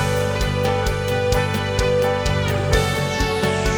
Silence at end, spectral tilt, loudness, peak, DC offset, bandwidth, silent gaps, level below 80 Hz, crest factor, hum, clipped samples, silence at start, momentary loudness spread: 0 s; -5 dB/octave; -20 LUFS; -4 dBFS; 0.4%; over 20 kHz; none; -28 dBFS; 16 dB; none; under 0.1%; 0 s; 2 LU